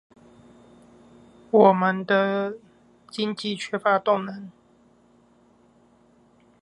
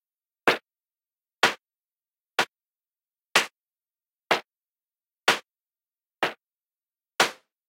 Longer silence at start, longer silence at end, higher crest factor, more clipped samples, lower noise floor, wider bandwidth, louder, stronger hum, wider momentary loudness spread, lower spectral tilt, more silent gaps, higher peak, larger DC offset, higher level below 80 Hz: first, 1.55 s vs 0.45 s; first, 2.1 s vs 0.35 s; second, 22 dB vs 28 dB; neither; second, -58 dBFS vs under -90 dBFS; second, 11 kHz vs 16 kHz; first, -22 LUFS vs -26 LUFS; neither; first, 20 LU vs 7 LU; first, -6 dB/octave vs -1 dB/octave; neither; about the same, -4 dBFS vs -4 dBFS; neither; first, -72 dBFS vs -78 dBFS